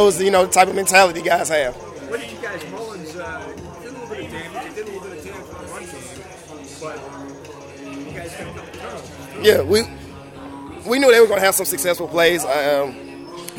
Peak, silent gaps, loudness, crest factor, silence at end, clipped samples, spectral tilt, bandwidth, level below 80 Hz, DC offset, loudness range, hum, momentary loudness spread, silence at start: -2 dBFS; none; -17 LUFS; 20 dB; 0 s; under 0.1%; -3 dB/octave; 16.5 kHz; -52 dBFS; under 0.1%; 16 LU; none; 22 LU; 0 s